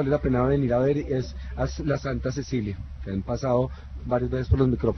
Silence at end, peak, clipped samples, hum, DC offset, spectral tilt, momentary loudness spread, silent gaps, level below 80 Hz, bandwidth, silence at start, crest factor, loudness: 0 s; -8 dBFS; under 0.1%; none; under 0.1%; -8 dB/octave; 10 LU; none; -36 dBFS; 6.4 kHz; 0 s; 16 dB; -26 LUFS